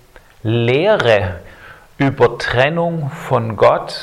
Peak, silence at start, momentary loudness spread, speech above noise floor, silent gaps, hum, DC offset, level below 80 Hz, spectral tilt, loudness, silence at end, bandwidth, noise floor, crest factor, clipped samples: 0 dBFS; 0.45 s; 10 LU; 25 dB; none; none; under 0.1%; -44 dBFS; -6.5 dB/octave; -15 LUFS; 0 s; 13.5 kHz; -40 dBFS; 16 dB; under 0.1%